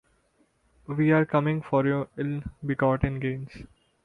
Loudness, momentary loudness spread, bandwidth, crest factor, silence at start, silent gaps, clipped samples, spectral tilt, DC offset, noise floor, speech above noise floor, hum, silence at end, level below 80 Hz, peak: -26 LUFS; 13 LU; 5.2 kHz; 18 dB; 0.9 s; none; under 0.1%; -9.5 dB/octave; under 0.1%; -67 dBFS; 42 dB; none; 0.4 s; -46 dBFS; -10 dBFS